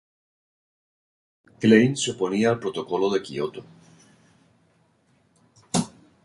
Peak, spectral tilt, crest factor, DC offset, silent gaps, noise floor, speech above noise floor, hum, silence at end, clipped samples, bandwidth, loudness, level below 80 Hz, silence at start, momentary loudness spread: -4 dBFS; -5 dB/octave; 22 dB; under 0.1%; none; -64 dBFS; 42 dB; none; 0.35 s; under 0.1%; 11.5 kHz; -23 LUFS; -64 dBFS; 1.6 s; 14 LU